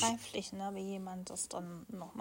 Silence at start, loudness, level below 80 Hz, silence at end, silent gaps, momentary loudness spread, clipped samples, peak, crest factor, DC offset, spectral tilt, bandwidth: 0 s; -41 LUFS; -72 dBFS; 0 s; none; 7 LU; under 0.1%; -18 dBFS; 22 dB; under 0.1%; -3 dB/octave; 16.5 kHz